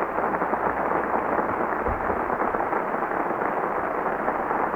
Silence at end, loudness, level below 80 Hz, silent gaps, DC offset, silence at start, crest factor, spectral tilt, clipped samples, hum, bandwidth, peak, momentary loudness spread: 0 s; -25 LUFS; -46 dBFS; none; under 0.1%; 0 s; 16 dB; -8 dB/octave; under 0.1%; none; over 20 kHz; -8 dBFS; 2 LU